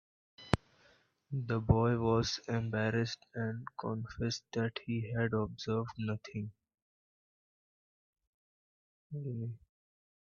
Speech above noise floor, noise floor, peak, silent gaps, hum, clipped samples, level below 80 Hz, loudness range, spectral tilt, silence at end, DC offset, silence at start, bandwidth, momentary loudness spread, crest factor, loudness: 34 dB; -68 dBFS; -8 dBFS; 6.82-8.13 s, 8.27-9.10 s; none; under 0.1%; -56 dBFS; 15 LU; -6.5 dB/octave; 0.65 s; under 0.1%; 0.4 s; 8.6 kHz; 13 LU; 30 dB; -36 LUFS